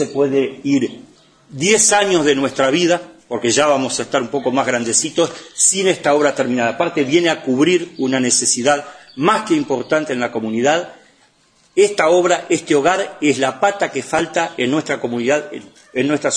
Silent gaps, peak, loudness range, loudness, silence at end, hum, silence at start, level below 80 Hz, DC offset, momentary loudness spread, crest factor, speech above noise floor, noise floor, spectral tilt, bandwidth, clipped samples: none; 0 dBFS; 3 LU; -16 LUFS; 0 s; none; 0 s; -60 dBFS; under 0.1%; 8 LU; 16 dB; 39 dB; -56 dBFS; -3 dB/octave; 10.5 kHz; under 0.1%